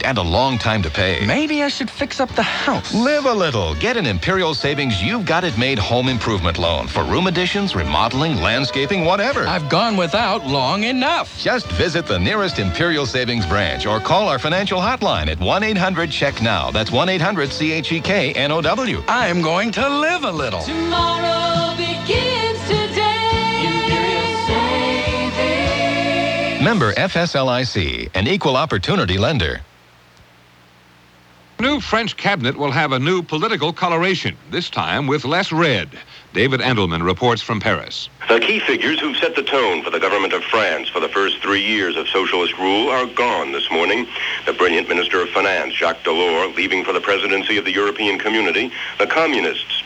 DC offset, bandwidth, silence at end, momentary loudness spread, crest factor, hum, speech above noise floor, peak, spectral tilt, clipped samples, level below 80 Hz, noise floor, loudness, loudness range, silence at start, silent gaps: under 0.1%; 12 kHz; 0 s; 3 LU; 16 dB; none; 31 dB; -2 dBFS; -5 dB/octave; under 0.1%; -38 dBFS; -49 dBFS; -18 LUFS; 1 LU; 0 s; none